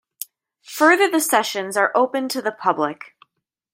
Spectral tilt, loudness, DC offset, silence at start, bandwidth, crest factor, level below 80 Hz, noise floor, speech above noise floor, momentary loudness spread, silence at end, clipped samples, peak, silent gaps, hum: -2.5 dB/octave; -19 LUFS; under 0.1%; 0.2 s; 16.5 kHz; 18 dB; -78 dBFS; -74 dBFS; 55 dB; 19 LU; 0.65 s; under 0.1%; -2 dBFS; none; none